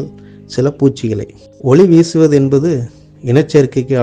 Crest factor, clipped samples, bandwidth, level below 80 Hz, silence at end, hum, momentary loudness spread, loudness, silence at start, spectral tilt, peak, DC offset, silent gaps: 12 dB; under 0.1%; 9.4 kHz; -46 dBFS; 0 s; none; 16 LU; -12 LUFS; 0 s; -7.5 dB/octave; 0 dBFS; under 0.1%; none